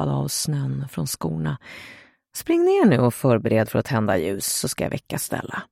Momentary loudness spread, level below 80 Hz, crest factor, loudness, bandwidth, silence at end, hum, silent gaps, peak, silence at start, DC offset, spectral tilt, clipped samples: 15 LU; -52 dBFS; 18 dB; -22 LUFS; 16.5 kHz; 0.1 s; none; none; -4 dBFS; 0 s; under 0.1%; -5.5 dB/octave; under 0.1%